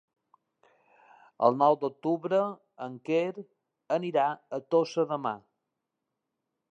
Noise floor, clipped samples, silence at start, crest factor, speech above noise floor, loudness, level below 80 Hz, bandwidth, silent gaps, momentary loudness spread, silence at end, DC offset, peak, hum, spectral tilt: -85 dBFS; under 0.1%; 1.4 s; 24 dB; 57 dB; -29 LUFS; -88 dBFS; 8 kHz; none; 15 LU; 1.35 s; under 0.1%; -8 dBFS; none; -6.5 dB/octave